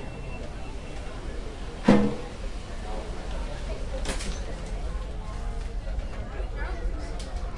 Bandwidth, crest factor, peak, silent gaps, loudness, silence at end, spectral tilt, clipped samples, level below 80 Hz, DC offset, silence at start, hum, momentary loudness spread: 11.5 kHz; 24 dB; -6 dBFS; none; -32 LUFS; 0 s; -6 dB/octave; under 0.1%; -34 dBFS; under 0.1%; 0 s; none; 13 LU